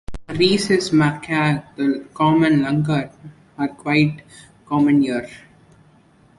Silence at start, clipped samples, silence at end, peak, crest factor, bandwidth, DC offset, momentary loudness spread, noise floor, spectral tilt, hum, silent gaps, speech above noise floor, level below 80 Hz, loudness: 0.1 s; under 0.1%; 1 s; -4 dBFS; 16 dB; 11.5 kHz; under 0.1%; 11 LU; -53 dBFS; -6 dB/octave; none; none; 34 dB; -48 dBFS; -19 LUFS